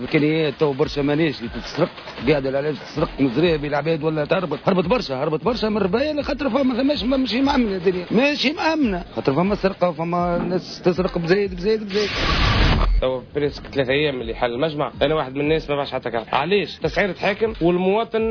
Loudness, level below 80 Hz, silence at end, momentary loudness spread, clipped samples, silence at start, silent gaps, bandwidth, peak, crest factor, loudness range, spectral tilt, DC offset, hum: -21 LUFS; -32 dBFS; 0 s; 5 LU; under 0.1%; 0 s; none; 5.4 kHz; -6 dBFS; 14 dB; 2 LU; -6.5 dB/octave; under 0.1%; none